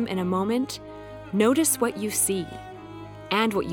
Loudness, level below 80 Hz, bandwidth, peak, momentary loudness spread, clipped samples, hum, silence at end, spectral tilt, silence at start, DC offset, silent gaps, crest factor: -24 LUFS; -56 dBFS; 19 kHz; -6 dBFS; 20 LU; under 0.1%; none; 0 s; -4 dB/octave; 0 s; under 0.1%; none; 20 dB